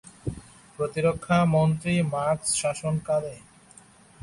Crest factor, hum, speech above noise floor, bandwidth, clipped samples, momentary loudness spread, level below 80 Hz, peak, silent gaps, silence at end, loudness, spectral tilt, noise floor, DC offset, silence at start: 18 dB; none; 29 dB; 11.5 kHz; under 0.1%; 15 LU; -52 dBFS; -8 dBFS; none; 0.85 s; -25 LUFS; -5.5 dB/octave; -53 dBFS; under 0.1%; 0.05 s